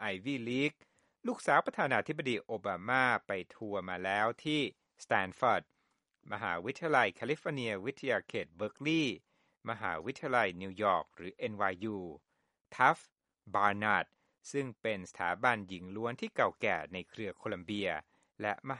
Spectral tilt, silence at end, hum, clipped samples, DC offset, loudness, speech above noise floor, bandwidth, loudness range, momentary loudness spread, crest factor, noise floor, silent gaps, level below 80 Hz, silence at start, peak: -5 dB/octave; 0 s; none; under 0.1%; under 0.1%; -34 LUFS; 46 dB; 11.5 kHz; 3 LU; 12 LU; 24 dB; -80 dBFS; 12.61-12.65 s; -74 dBFS; 0 s; -10 dBFS